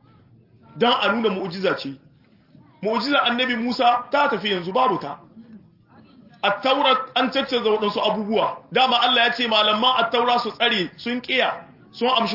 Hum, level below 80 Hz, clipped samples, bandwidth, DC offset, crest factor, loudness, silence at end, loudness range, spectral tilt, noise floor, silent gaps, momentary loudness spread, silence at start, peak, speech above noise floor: none; -68 dBFS; under 0.1%; 5.8 kHz; under 0.1%; 18 dB; -20 LUFS; 0 s; 4 LU; -5 dB/octave; -54 dBFS; none; 8 LU; 0.75 s; -4 dBFS; 33 dB